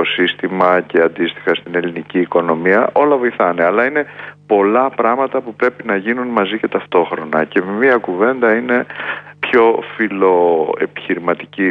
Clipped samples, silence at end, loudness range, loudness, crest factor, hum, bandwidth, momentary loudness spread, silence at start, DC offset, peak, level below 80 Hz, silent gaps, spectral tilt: under 0.1%; 0 s; 2 LU; -15 LUFS; 14 dB; none; 5.2 kHz; 7 LU; 0 s; under 0.1%; 0 dBFS; -62 dBFS; none; -7.5 dB/octave